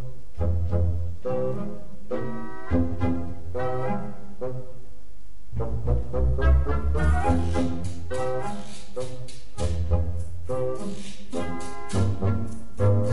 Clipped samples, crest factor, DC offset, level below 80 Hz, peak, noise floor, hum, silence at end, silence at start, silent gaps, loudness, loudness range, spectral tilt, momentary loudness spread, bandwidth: under 0.1%; 18 dB; 6%; -30 dBFS; -8 dBFS; -47 dBFS; none; 0 s; 0 s; none; -28 LUFS; 5 LU; -7.5 dB/octave; 13 LU; 11.5 kHz